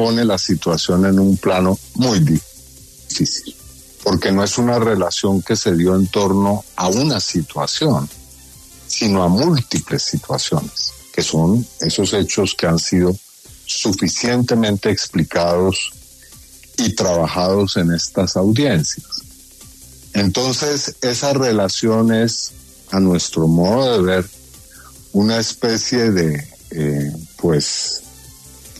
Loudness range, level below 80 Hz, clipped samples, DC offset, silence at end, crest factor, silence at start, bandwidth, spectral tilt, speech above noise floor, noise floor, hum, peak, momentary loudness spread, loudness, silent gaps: 2 LU; -44 dBFS; under 0.1%; under 0.1%; 0 s; 14 dB; 0 s; 13.5 kHz; -5 dB/octave; 26 dB; -42 dBFS; none; -4 dBFS; 8 LU; -17 LUFS; none